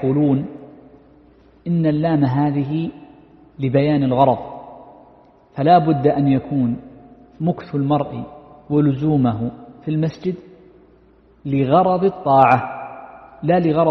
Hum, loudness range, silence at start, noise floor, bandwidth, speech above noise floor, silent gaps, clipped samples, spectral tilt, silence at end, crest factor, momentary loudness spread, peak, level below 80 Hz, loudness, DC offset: none; 4 LU; 0 s; -51 dBFS; 6 kHz; 35 dB; none; under 0.1%; -10.5 dB/octave; 0 s; 18 dB; 18 LU; 0 dBFS; -52 dBFS; -18 LUFS; under 0.1%